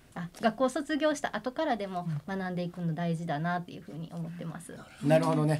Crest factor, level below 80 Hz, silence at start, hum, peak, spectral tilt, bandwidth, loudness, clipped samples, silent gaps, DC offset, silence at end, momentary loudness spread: 20 dB; -66 dBFS; 0.15 s; none; -12 dBFS; -6.5 dB/octave; 13.5 kHz; -31 LUFS; under 0.1%; none; under 0.1%; 0 s; 15 LU